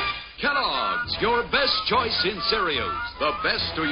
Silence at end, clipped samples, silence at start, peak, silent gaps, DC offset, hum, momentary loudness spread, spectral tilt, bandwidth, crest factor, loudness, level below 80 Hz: 0 s; under 0.1%; 0 s; -8 dBFS; none; under 0.1%; none; 5 LU; -6 dB/octave; 7.2 kHz; 16 dB; -23 LUFS; -46 dBFS